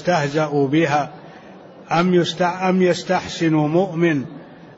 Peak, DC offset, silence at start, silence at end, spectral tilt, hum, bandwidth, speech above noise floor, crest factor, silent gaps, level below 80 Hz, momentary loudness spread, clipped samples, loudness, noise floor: -6 dBFS; under 0.1%; 0 s; 0.05 s; -6 dB/octave; none; 8 kHz; 23 dB; 14 dB; none; -58 dBFS; 6 LU; under 0.1%; -19 LUFS; -41 dBFS